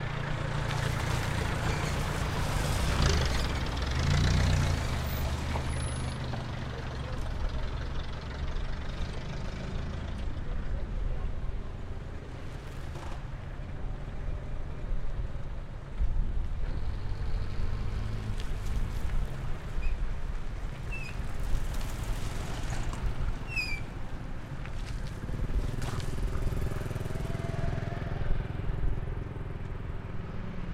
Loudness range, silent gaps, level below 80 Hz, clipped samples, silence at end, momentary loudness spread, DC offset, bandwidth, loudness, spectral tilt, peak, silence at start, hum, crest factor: 10 LU; none; -34 dBFS; under 0.1%; 0 s; 10 LU; under 0.1%; 15.5 kHz; -35 LUFS; -5.5 dB/octave; -12 dBFS; 0 s; none; 20 dB